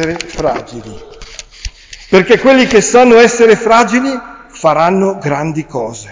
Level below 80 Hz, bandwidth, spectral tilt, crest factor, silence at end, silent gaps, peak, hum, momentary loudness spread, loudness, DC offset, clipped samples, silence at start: -36 dBFS; 7.6 kHz; -4.5 dB/octave; 10 dB; 0 s; none; 0 dBFS; none; 22 LU; -10 LUFS; under 0.1%; under 0.1%; 0 s